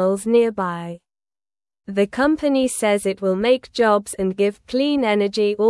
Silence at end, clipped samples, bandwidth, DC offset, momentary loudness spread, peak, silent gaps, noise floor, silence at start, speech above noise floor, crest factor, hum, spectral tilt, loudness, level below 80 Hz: 0 s; under 0.1%; 12 kHz; under 0.1%; 8 LU; -4 dBFS; none; under -90 dBFS; 0 s; over 71 dB; 16 dB; none; -5 dB/octave; -20 LUFS; -54 dBFS